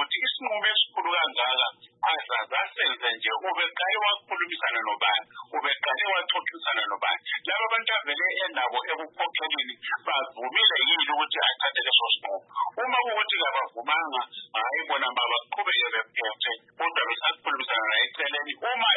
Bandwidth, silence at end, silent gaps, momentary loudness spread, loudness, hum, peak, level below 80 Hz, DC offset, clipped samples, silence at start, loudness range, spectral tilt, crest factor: 4.1 kHz; 0 s; none; 8 LU; -25 LUFS; none; -8 dBFS; under -90 dBFS; under 0.1%; under 0.1%; 0 s; 3 LU; -3.5 dB/octave; 18 dB